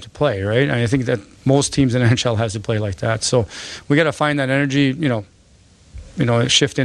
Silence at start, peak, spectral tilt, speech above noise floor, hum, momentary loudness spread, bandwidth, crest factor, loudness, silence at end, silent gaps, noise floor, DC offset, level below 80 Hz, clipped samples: 0 s; -2 dBFS; -5 dB/octave; 33 dB; none; 7 LU; 11 kHz; 16 dB; -18 LUFS; 0 s; none; -50 dBFS; under 0.1%; -44 dBFS; under 0.1%